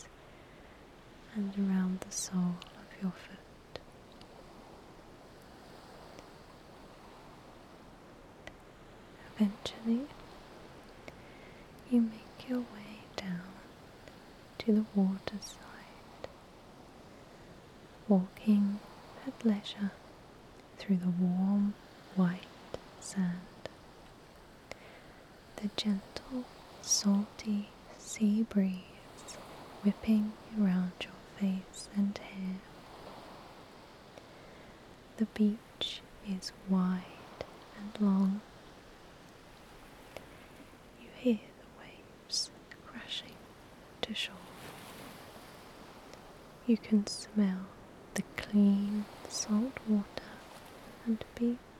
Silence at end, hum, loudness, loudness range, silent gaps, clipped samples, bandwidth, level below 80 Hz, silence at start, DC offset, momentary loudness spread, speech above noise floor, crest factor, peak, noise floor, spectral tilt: 0 s; none; -34 LUFS; 11 LU; none; under 0.1%; 14 kHz; -64 dBFS; 0 s; under 0.1%; 24 LU; 23 dB; 22 dB; -14 dBFS; -55 dBFS; -5.5 dB/octave